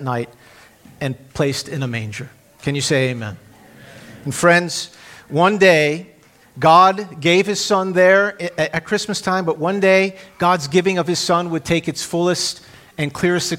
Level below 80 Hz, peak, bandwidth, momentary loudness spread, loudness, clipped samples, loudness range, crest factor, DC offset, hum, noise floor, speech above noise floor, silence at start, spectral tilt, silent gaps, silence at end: -54 dBFS; 0 dBFS; 16.5 kHz; 15 LU; -17 LUFS; under 0.1%; 8 LU; 18 dB; under 0.1%; none; -43 dBFS; 26 dB; 0 s; -4.5 dB/octave; none; 0 s